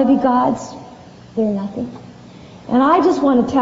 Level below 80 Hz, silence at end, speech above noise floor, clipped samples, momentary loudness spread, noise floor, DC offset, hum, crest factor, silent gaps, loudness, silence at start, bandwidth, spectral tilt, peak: -50 dBFS; 0 s; 24 dB; under 0.1%; 21 LU; -39 dBFS; under 0.1%; none; 14 dB; none; -17 LUFS; 0 s; 7.8 kHz; -6 dB/octave; -2 dBFS